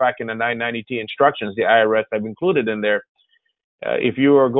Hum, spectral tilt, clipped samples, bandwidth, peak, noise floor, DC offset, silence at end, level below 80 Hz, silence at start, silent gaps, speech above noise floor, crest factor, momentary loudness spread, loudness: none; -10 dB/octave; under 0.1%; 4 kHz; -2 dBFS; -64 dBFS; under 0.1%; 0 s; -62 dBFS; 0 s; 3.09-3.15 s, 3.64-3.78 s; 45 dB; 16 dB; 10 LU; -19 LUFS